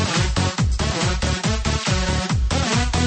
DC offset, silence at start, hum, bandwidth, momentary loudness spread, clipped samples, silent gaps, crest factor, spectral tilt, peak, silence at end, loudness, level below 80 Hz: under 0.1%; 0 s; none; 8.8 kHz; 2 LU; under 0.1%; none; 14 dB; -4.5 dB/octave; -6 dBFS; 0 s; -21 LUFS; -26 dBFS